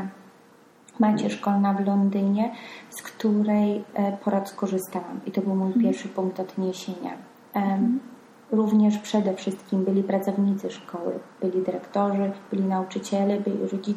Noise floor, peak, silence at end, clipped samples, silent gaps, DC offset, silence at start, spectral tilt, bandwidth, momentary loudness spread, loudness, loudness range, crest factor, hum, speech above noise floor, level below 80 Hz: -54 dBFS; -10 dBFS; 0 s; under 0.1%; none; under 0.1%; 0 s; -7 dB/octave; 15 kHz; 10 LU; -25 LUFS; 3 LU; 16 dB; none; 30 dB; -74 dBFS